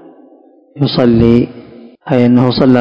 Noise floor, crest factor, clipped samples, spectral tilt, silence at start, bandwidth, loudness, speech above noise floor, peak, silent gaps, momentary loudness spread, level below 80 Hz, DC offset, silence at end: -44 dBFS; 12 dB; 2%; -9 dB/octave; 0.75 s; 5.6 kHz; -11 LUFS; 35 dB; 0 dBFS; none; 10 LU; -36 dBFS; under 0.1%; 0 s